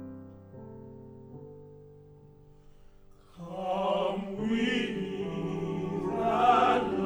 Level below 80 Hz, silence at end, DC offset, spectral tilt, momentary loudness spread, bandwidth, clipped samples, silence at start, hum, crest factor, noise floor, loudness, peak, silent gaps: -58 dBFS; 0 s; under 0.1%; -6.5 dB/octave; 25 LU; 11.5 kHz; under 0.1%; 0 s; none; 20 dB; -55 dBFS; -29 LUFS; -12 dBFS; none